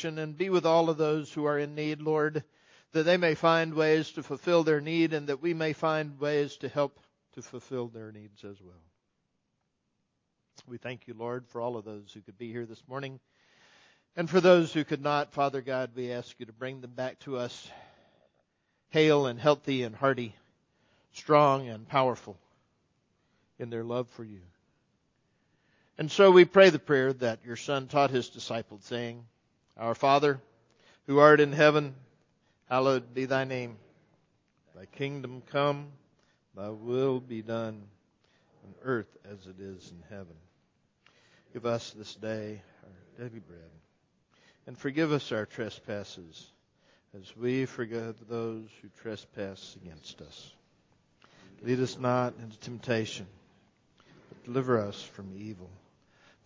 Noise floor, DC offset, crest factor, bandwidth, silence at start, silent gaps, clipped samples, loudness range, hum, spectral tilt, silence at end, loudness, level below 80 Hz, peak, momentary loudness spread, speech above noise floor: -79 dBFS; under 0.1%; 26 dB; 7.6 kHz; 0 s; none; under 0.1%; 17 LU; none; -6 dB/octave; 0.8 s; -28 LUFS; -72 dBFS; -4 dBFS; 23 LU; 50 dB